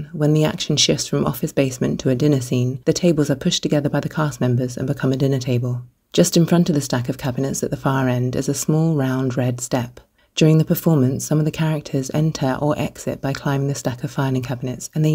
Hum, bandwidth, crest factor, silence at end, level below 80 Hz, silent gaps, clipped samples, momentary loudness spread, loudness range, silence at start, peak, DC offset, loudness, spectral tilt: none; 16 kHz; 18 dB; 0 s; -50 dBFS; none; under 0.1%; 8 LU; 2 LU; 0 s; -2 dBFS; under 0.1%; -20 LUFS; -5.5 dB/octave